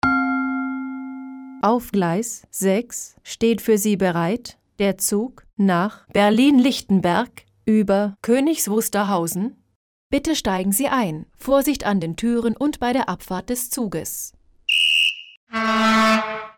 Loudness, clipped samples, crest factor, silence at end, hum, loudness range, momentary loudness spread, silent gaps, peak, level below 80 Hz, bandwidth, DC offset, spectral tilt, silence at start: -20 LUFS; under 0.1%; 14 dB; 0.05 s; none; 4 LU; 14 LU; 9.76-10.10 s, 15.37-15.47 s; -6 dBFS; -50 dBFS; over 20 kHz; under 0.1%; -4 dB/octave; 0.05 s